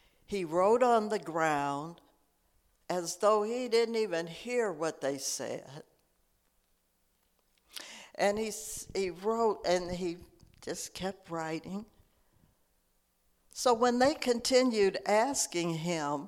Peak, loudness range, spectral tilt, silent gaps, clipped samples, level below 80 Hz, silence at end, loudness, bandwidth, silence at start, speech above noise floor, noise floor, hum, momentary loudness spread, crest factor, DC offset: -12 dBFS; 10 LU; -3.5 dB/octave; none; under 0.1%; -64 dBFS; 0 s; -31 LUFS; 16.5 kHz; 0.3 s; 43 dB; -74 dBFS; none; 16 LU; 20 dB; under 0.1%